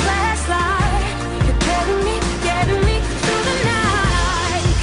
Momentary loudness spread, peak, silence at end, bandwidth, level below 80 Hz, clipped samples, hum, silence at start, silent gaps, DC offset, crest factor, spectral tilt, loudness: 3 LU; -6 dBFS; 0 s; 11 kHz; -24 dBFS; under 0.1%; none; 0 s; none; under 0.1%; 12 dB; -4.5 dB/octave; -18 LUFS